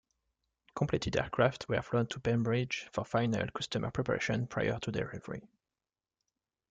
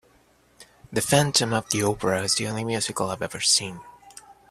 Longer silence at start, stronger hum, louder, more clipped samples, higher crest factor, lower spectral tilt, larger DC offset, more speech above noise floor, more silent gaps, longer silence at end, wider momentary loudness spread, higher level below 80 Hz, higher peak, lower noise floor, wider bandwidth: first, 0.75 s vs 0.6 s; neither; second, -34 LUFS vs -23 LUFS; neither; about the same, 20 dB vs 22 dB; first, -6 dB/octave vs -3 dB/octave; neither; first, over 57 dB vs 36 dB; neither; first, 1.25 s vs 0.2 s; about the same, 8 LU vs 9 LU; about the same, -58 dBFS vs -56 dBFS; second, -14 dBFS vs -4 dBFS; first, under -90 dBFS vs -60 dBFS; second, 9.2 kHz vs 15.5 kHz